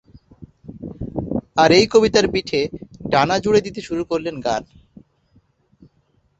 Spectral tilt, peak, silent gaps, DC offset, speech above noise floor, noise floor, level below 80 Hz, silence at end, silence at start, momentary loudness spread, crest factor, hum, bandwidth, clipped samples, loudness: -4.5 dB/octave; -2 dBFS; none; under 0.1%; 45 dB; -62 dBFS; -46 dBFS; 1.75 s; 0.4 s; 19 LU; 20 dB; none; 8.2 kHz; under 0.1%; -18 LUFS